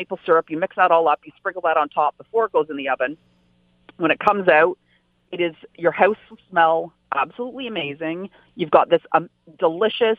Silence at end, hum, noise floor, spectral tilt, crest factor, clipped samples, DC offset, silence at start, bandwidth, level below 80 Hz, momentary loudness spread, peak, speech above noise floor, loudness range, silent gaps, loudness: 0.05 s; none; -60 dBFS; -7 dB/octave; 20 dB; under 0.1%; under 0.1%; 0 s; 5 kHz; -66 dBFS; 12 LU; 0 dBFS; 40 dB; 3 LU; none; -20 LUFS